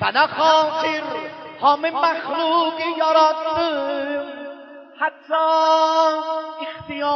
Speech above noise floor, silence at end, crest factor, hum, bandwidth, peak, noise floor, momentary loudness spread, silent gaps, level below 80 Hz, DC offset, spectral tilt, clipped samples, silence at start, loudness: 20 dB; 0 s; 16 dB; none; 6.6 kHz; -4 dBFS; -39 dBFS; 14 LU; none; -64 dBFS; under 0.1%; -3.5 dB/octave; under 0.1%; 0 s; -19 LUFS